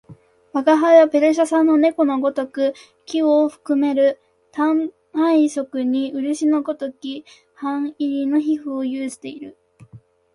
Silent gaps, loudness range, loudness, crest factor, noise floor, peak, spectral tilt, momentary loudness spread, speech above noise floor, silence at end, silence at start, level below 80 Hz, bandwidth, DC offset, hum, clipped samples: none; 8 LU; -19 LUFS; 16 dB; -47 dBFS; -2 dBFS; -4.5 dB/octave; 14 LU; 29 dB; 0.4 s; 0.1 s; -68 dBFS; 11.5 kHz; under 0.1%; none; under 0.1%